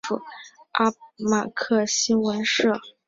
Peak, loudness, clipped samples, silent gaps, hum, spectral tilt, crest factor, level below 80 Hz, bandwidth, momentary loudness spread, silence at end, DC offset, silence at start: -6 dBFS; -23 LUFS; under 0.1%; none; none; -3 dB/octave; 20 dB; -64 dBFS; 7.8 kHz; 10 LU; 0.2 s; under 0.1%; 0.05 s